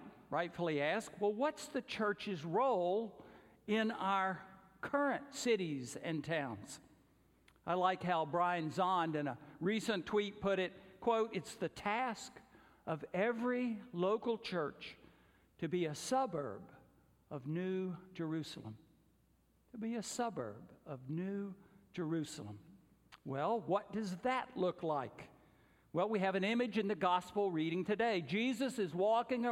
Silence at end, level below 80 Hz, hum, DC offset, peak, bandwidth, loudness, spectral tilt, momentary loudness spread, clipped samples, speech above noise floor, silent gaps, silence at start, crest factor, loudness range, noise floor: 0 s; -74 dBFS; none; under 0.1%; -20 dBFS; 16 kHz; -38 LUFS; -5.5 dB/octave; 15 LU; under 0.1%; 35 dB; none; 0 s; 18 dB; 7 LU; -73 dBFS